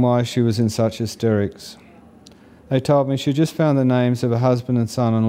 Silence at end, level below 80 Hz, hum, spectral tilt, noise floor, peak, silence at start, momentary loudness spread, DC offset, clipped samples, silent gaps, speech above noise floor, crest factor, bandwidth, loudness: 0 s; -56 dBFS; none; -7 dB/octave; -46 dBFS; -4 dBFS; 0 s; 5 LU; under 0.1%; under 0.1%; none; 28 dB; 14 dB; 15.5 kHz; -19 LUFS